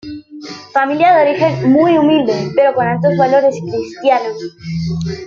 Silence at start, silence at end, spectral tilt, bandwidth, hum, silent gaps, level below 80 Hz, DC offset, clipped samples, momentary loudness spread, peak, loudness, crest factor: 0.05 s; 0 s; -7 dB/octave; 7.2 kHz; none; none; -50 dBFS; under 0.1%; under 0.1%; 14 LU; 0 dBFS; -13 LUFS; 12 dB